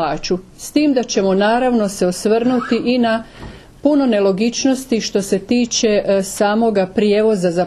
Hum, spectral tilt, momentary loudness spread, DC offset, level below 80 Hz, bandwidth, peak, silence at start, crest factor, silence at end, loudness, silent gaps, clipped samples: none; -4.5 dB/octave; 6 LU; under 0.1%; -44 dBFS; 13 kHz; -2 dBFS; 0 s; 14 dB; 0 s; -16 LUFS; none; under 0.1%